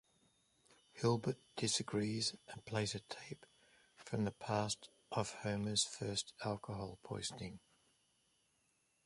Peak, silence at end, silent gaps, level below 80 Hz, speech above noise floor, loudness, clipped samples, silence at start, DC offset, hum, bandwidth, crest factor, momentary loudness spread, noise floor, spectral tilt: -22 dBFS; 1.5 s; none; -70 dBFS; 38 dB; -41 LUFS; under 0.1%; 0.95 s; under 0.1%; none; 11.5 kHz; 22 dB; 14 LU; -79 dBFS; -4 dB/octave